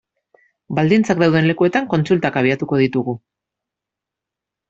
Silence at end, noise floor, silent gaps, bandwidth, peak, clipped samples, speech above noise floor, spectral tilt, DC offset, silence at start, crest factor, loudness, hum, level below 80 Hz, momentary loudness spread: 1.55 s; -85 dBFS; none; 7.8 kHz; -2 dBFS; under 0.1%; 68 dB; -7 dB/octave; under 0.1%; 0.7 s; 16 dB; -17 LUFS; none; -56 dBFS; 9 LU